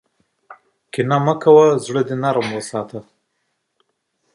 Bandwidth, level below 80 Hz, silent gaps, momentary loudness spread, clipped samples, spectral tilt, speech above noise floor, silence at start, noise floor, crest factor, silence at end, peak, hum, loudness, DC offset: 11.5 kHz; -64 dBFS; none; 17 LU; under 0.1%; -6.5 dB/octave; 55 dB; 0.5 s; -71 dBFS; 18 dB; 1.35 s; 0 dBFS; none; -17 LUFS; under 0.1%